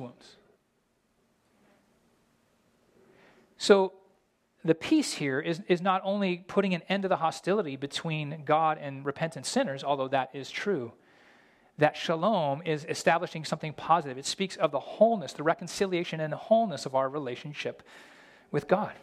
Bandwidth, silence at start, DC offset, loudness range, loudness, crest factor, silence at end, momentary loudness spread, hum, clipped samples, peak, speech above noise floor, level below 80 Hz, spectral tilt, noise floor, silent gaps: 14.5 kHz; 0 s; under 0.1%; 3 LU; -29 LUFS; 24 dB; 0.05 s; 9 LU; none; under 0.1%; -6 dBFS; 44 dB; -74 dBFS; -5 dB/octave; -73 dBFS; none